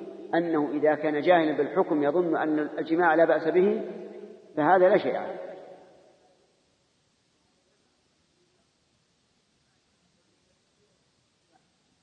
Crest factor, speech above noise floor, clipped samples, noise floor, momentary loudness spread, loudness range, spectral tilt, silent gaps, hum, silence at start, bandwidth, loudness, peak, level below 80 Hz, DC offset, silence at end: 20 dB; 46 dB; under 0.1%; -70 dBFS; 18 LU; 5 LU; -8 dB/octave; none; none; 0 s; 6.2 kHz; -24 LUFS; -8 dBFS; -84 dBFS; under 0.1%; 6.3 s